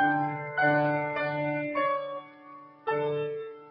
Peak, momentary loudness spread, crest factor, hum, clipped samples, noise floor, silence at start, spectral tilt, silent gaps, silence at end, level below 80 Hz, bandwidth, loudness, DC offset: -12 dBFS; 16 LU; 16 dB; none; under 0.1%; -49 dBFS; 0 s; -9.5 dB/octave; none; 0 s; -74 dBFS; 5.4 kHz; -29 LUFS; under 0.1%